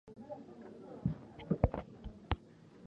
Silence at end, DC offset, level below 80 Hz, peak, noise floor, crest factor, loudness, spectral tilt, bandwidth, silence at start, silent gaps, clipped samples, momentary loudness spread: 0 s; under 0.1%; -48 dBFS; -12 dBFS; -58 dBFS; 28 dB; -40 LUFS; -9 dB/octave; 7.8 kHz; 0.05 s; none; under 0.1%; 17 LU